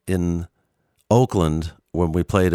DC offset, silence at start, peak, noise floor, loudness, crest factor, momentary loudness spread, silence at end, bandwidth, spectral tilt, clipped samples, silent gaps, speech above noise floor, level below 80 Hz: under 0.1%; 0.05 s; -2 dBFS; -68 dBFS; -21 LUFS; 18 dB; 11 LU; 0 s; 14.5 kHz; -7 dB/octave; under 0.1%; none; 48 dB; -38 dBFS